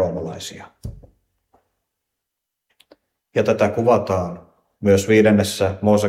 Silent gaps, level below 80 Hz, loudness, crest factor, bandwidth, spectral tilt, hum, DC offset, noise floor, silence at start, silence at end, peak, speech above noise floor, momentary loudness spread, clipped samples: none; -50 dBFS; -18 LUFS; 18 dB; 15.5 kHz; -6 dB/octave; none; under 0.1%; -81 dBFS; 0 s; 0 s; -2 dBFS; 64 dB; 22 LU; under 0.1%